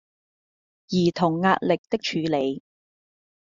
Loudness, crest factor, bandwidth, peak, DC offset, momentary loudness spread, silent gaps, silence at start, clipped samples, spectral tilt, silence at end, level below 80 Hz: -24 LUFS; 20 dB; 7.4 kHz; -4 dBFS; under 0.1%; 7 LU; 1.78-1.84 s; 0.9 s; under 0.1%; -4.5 dB/octave; 0.9 s; -64 dBFS